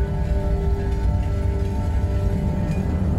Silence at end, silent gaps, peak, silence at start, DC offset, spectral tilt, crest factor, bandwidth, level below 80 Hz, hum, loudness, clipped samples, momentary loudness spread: 0 s; none; -10 dBFS; 0 s; under 0.1%; -8.5 dB/octave; 10 dB; 10.5 kHz; -24 dBFS; none; -23 LUFS; under 0.1%; 1 LU